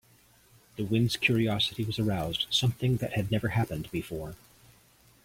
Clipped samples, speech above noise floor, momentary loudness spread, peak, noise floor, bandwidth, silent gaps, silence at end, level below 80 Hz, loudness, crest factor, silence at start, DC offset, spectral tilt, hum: under 0.1%; 32 dB; 13 LU; -12 dBFS; -61 dBFS; 16.5 kHz; none; 0.9 s; -54 dBFS; -29 LUFS; 18 dB; 0.75 s; under 0.1%; -5.5 dB/octave; none